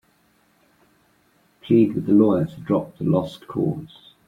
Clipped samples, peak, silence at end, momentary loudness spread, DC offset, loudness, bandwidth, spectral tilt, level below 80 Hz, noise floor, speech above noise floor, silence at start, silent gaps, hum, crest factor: under 0.1%; -4 dBFS; 0.4 s; 9 LU; under 0.1%; -21 LUFS; 7.2 kHz; -9.5 dB/octave; -58 dBFS; -62 dBFS; 41 dB; 1.65 s; none; none; 18 dB